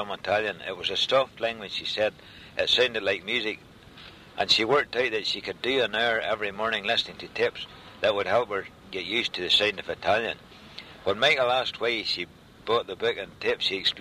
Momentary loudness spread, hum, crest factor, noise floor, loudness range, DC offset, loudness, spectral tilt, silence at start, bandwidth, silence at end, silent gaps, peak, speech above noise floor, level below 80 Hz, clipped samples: 14 LU; none; 18 dB; -48 dBFS; 2 LU; under 0.1%; -26 LUFS; -3 dB/octave; 0 s; 15 kHz; 0 s; none; -8 dBFS; 21 dB; -60 dBFS; under 0.1%